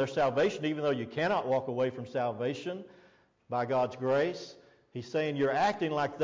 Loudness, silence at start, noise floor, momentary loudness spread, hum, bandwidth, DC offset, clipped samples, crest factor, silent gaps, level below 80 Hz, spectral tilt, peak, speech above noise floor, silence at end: -31 LUFS; 0 s; -63 dBFS; 12 LU; none; 7.6 kHz; under 0.1%; under 0.1%; 12 dB; none; -70 dBFS; -6 dB/octave; -20 dBFS; 32 dB; 0 s